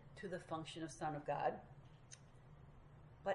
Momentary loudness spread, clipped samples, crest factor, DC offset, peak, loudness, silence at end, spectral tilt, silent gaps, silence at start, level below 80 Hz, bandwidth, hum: 21 LU; under 0.1%; 22 dB; under 0.1%; -26 dBFS; -46 LUFS; 0 s; -5 dB/octave; none; 0 s; -70 dBFS; 11 kHz; none